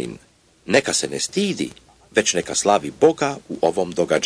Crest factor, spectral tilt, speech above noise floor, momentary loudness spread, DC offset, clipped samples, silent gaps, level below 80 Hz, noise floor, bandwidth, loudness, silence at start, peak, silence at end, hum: 20 dB; -3 dB/octave; 34 dB; 7 LU; under 0.1%; under 0.1%; none; -58 dBFS; -54 dBFS; 11 kHz; -20 LUFS; 0 s; -2 dBFS; 0 s; none